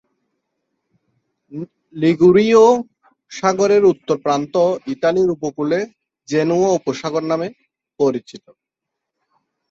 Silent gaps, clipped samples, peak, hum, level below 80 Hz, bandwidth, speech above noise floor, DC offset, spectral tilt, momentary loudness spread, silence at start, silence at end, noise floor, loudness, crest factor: none; under 0.1%; -2 dBFS; none; -60 dBFS; 7.8 kHz; 65 dB; under 0.1%; -6 dB/octave; 20 LU; 1.5 s; 1.35 s; -81 dBFS; -17 LUFS; 16 dB